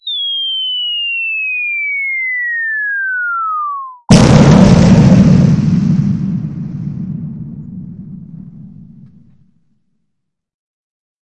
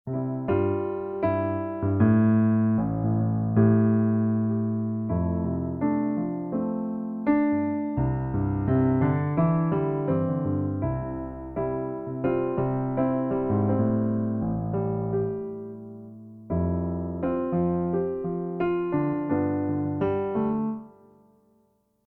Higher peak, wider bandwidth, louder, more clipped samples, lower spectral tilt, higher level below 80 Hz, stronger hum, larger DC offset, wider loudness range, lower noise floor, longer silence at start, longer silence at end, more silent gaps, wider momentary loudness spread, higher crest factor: first, 0 dBFS vs -10 dBFS; first, 11.5 kHz vs 3.2 kHz; first, -11 LUFS vs -26 LUFS; first, 0.2% vs under 0.1%; second, -6 dB/octave vs -13 dB/octave; first, -32 dBFS vs -48 dBFS; neither; neither; first, 18 LU vs 6 LU; first, -73 dBFS vs -67 dBFS; about the same, 0.05 s vs 0.05 s; first, 2.45 s vs 1.2 s; neither; first, 22 LU vs 9 LU; about the same, 14 dB vs 16 dB